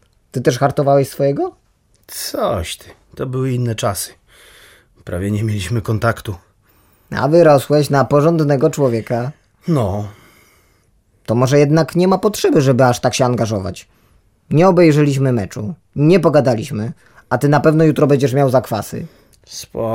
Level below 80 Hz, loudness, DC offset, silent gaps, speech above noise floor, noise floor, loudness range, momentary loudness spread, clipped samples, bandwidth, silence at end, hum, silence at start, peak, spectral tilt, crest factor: -46 dBFS; -15 LUFS; under 0.1%; none; 42 dB; -57 dBFS; 8 LU; 16 LU; under 0.1%; 16.5 kHz; 0 s; none; 0.35 s; -2 dBFS; -6.5 dB/octave; 14 dB